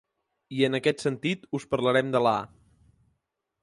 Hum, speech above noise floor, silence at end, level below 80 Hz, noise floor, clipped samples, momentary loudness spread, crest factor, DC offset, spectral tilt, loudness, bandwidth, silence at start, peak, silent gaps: none; 54 dB; 1.15 s; -64 dBFS; -79 dBFS; under 0.1%; 9 LU; 20 dB; under 0.1%; -5.5 dB/octave; -26 LUFS; 11.5 kHz; 0.5 s; -10 dBFS; none